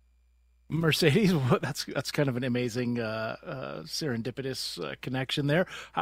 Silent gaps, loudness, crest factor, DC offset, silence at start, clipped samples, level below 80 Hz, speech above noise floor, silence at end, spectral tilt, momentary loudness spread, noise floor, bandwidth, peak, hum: none; -29 LUFS; 22 dB; under 0.1%; 0.7 s; under 0.1%; -58 dBFS; 35 dB; 0 s; -5.5 dB/octave; 12 LU; -64 dBFS; 16 kHz; -6 dBFS; none